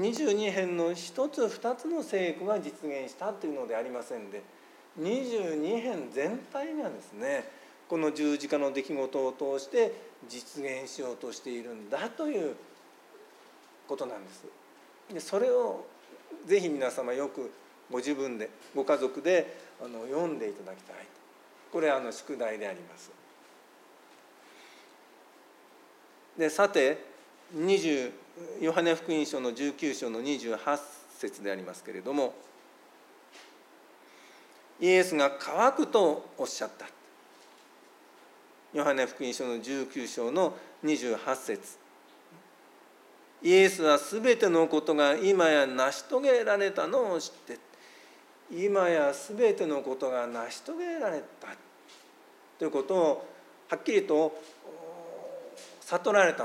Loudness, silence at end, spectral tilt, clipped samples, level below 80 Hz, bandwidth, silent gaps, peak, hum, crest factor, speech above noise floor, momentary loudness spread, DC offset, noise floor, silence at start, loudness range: -30 LUFS; 0 s; -4 dB/octave; under 0.1%; under -90 dBFS; 16 kHz; none; -10 dBFS; none; 22 dB; 28 dB; 19 LU; under 0.1%; -57 dBFS; 0 s; 10 LU